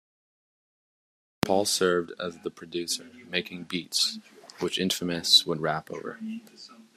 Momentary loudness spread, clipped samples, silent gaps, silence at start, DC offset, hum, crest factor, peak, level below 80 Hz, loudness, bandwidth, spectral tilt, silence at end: 19 LU; under 0.1%; none; 1.45 s; under 0.1%; none; 28 dB; -2 dBFS; -68 dBFS; -26 LUFS; 14.5 kHz; -2.5 dB/octave; 0.15 s